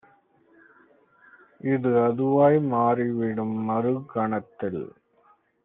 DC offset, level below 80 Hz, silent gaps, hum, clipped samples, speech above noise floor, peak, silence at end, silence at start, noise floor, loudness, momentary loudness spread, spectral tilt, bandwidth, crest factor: under 0.1%; -70 dBFS; none; none; under 0.1%; 39 dB; -8 dBFS; 0.75 s; 1.65 s; -62 dBFS; -24 LUFS; 12 LU; -8.5 dB/octave; 3.8 kHz; 18 dB